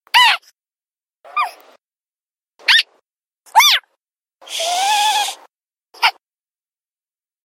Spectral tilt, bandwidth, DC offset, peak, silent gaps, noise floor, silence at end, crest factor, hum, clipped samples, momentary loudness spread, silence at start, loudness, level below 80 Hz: 4.5 dB/octave; 16.5 kHz; under 0.1%; 0 dBFS; 3.27-3.31 s, 5.65-5.69 s; under -90 dBFS; 1.35 s; 20 dB; none; under 0.1%; 14 LU; 0.15 s; -15 LUFS; -76 dBFS